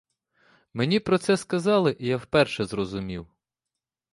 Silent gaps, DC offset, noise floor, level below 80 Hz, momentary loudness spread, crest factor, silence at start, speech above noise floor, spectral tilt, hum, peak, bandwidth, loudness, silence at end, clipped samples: none; under 0.1%; -87 dBFS; -56 dBFS; 12 LU; 18 dB; 0.75 s; 63 dB; -5.5 dB/octave; none; -8 dBFS; 11.5 kHz; -24 LUFS; 0.9 s; under 0.1%